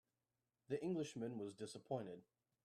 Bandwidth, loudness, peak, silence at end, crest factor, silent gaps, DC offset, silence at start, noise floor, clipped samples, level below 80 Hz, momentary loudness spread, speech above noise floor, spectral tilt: 13 kHz; -48 LUFS; -30 dBFS; 0.45 s; 18 dB; none; under 0.1%; 0.7 s; under -90 dBFS; under 0.1%; -88 dBFS; 10 LU; over 43 dB; -6 dB/octave